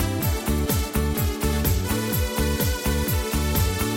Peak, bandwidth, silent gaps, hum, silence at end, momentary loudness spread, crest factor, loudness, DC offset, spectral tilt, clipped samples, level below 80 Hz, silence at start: -8 dBFS; 17 kHz; none; none; 0 s; 2 LU; 14 dB; -24 LUFS; under 0.1%; -5 dB/octave; under 0.1%; -28 dBFS; 0 s